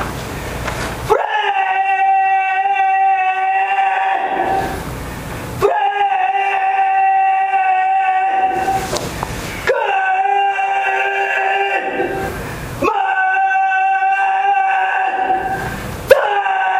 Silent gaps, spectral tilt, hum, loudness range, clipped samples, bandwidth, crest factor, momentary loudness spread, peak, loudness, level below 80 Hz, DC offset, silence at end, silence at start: none; -4 dB/octave; none; 2 LU; under 0.1%; 16 kHz; 16 dB; 10 LU; 0 dBFS; -16 LUFS; -38 dBFS; under 0.1%; 0 s; 0 s